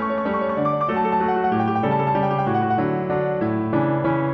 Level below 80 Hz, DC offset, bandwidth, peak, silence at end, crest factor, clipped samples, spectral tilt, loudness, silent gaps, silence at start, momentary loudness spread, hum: -52 dBFS; under 0.1%; 6 kHz; -8 dBFS; 0 s; 12 dB; under 0.1%; -9.5 dB/octave; -21 LUFS; none; 0 s; 2 LU; none